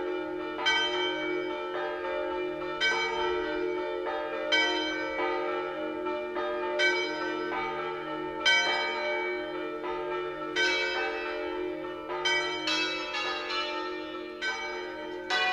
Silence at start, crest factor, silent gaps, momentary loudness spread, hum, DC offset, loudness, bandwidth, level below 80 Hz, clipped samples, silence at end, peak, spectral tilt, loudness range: 0 s; 18 dB; none; 9 LU; none; under 0.1%; -30 LUFS; 11 kHz; -62 dBFS; under 0.1%; 0 s; -12 dBFS; -2 dB/octave; 2 LU